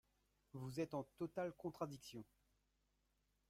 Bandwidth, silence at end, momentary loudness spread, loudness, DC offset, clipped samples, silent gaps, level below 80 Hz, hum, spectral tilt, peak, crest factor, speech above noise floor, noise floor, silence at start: 16 kHz; 1.25 s; 13 LU; -49 LUFS; under 0.1%; under 0.1%; none; -80 dBFS; 50 Hz at -75 dBFS; -6.5 dB/octave; -30 dBFS; 20 dB; 36 dB; -84 dBFS; 0.55 s